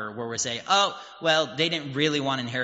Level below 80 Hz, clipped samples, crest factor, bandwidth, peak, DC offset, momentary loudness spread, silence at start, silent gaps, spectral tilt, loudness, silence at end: -68 dBFS; under 0.1%; 20 dB; 8 kHz; -6 dBFS; under 0.1%; 6 LU; 0 s; none; -2 dB/octave; -25 LUFS; 0 s